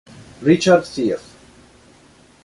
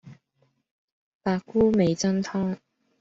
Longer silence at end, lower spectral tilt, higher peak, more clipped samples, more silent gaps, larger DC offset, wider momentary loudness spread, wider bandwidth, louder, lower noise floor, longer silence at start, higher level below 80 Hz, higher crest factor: first, 1.25 s vs 0.45 s; about the same, -5.5 dB/octave vs -6 dB/octave; first, -2 dBFS vs -10 dBFS; neither; second, none vs 0.71-1.20 s; neither; about the same, 9 LU vs 11 LU; first, 11.5 kHz vs 8 kHz; first, -17 LUFS vs -25 LUFS; second, -50 dBFS vs -70 dBFS; first, 0.4 s vs 0.05 s; about the same, -54 dBFS vs -56 dBFS; about the same, 18 dB vs 18 dB